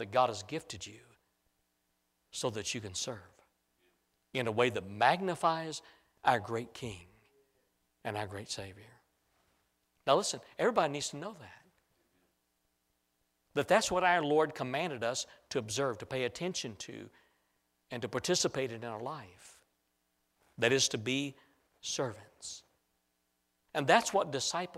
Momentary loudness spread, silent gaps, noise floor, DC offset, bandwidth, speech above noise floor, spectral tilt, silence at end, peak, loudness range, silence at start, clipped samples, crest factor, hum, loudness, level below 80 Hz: 17 LU; none; -80 dBFS; under 0.1%; 16 kHz; 46 dB; -3 dB/octave; 0 s; -10 dBFS; 7 LU; 0 s; under 0.1%; 24 dB; none; -33 LUFS; -70 dBFS